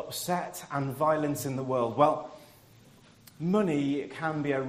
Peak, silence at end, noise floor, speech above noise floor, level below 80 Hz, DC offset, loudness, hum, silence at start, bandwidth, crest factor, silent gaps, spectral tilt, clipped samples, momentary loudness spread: -8 dBFS; 0 s; -56 dBFS; 28 dB; -68 dBFS; under 0.1%; -29 LUFS; none; 0 s; 15.5 kHz; 22 dB; none; -6 dB/octave; under 0.1%; 9 LU